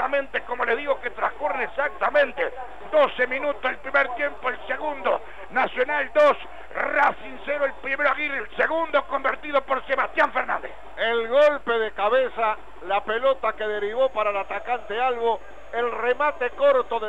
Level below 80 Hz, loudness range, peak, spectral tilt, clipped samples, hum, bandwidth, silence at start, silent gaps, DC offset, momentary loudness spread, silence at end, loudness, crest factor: -54 dBFS; 2 LU; -8 dBFS; -4.5 dB/octave; under 0.1%; none; 8 kHz; 0 s; none; 1%; 8 LU; 0 s; -24 LUFS; 16 dB